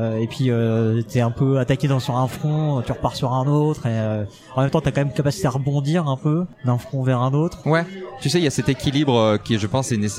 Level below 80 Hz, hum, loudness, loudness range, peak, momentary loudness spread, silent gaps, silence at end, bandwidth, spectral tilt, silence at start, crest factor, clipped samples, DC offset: -48 dBFS; none; -21 LUFS; 1 LU; -4 dBFS; 4 LU; none; 0 s; 14.5 kHz; -6.5 dB/octave; 0 s; 16 dB; under 0.1%; under 0.1%